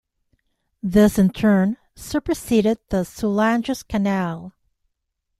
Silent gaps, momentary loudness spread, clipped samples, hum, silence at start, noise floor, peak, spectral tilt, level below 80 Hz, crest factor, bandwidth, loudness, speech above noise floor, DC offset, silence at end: none; 11 LU; under 0.1%; none; 0.85 s; -77 dBFS; -2 dBFS; -6.5 dB/octave; -44 dBFS; 18 dB; 14 kHz; -20 LUFS; 57 dB; under 0.1%; 0.9 s